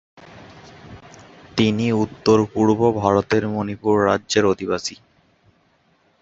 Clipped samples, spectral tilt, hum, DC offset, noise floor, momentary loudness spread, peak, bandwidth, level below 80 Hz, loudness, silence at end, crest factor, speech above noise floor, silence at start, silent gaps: under 0.1%; -5.5 dB/octave; none; under 0.1%; -61 dBFS; 8 LU; -2 dBFS; 8 kHz; -50 dBFS; -19 LUFS; 1.25 s; 20 dB; 42 dB; 0.35 s; none